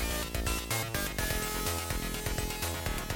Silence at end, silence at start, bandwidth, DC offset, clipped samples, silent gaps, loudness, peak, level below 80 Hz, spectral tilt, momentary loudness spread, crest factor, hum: 0 s; 0 s; 17 kHz; under 0.1%; under 0.1%; none; -33 LUFS; -18 dBFS; -38 dBFS; -3 dB/octave; 2 LU; 16 dB; none